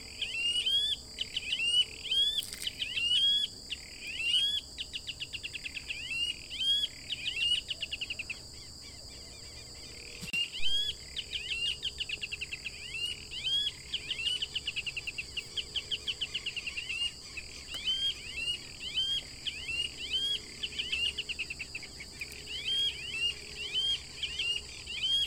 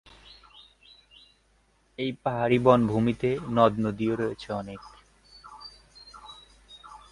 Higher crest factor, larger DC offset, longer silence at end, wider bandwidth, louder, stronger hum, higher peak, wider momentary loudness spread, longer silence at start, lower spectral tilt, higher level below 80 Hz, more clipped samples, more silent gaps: second, 16 dB vs 24 dB; neither; second, 0 s vs 0.15 s; first, 16 kHz vs 11 kHz; second, -32 LUFS vs -25 LUFS; neither; second, -18 dBFS vs -4 dBFS; second, 13 LU vs 26 LU; second, 0 s vs 2 s; second, 0 dB/octave vs -7.5 dB/octave; about the same, -56 dBFS vs -56 dBFS; neither; neither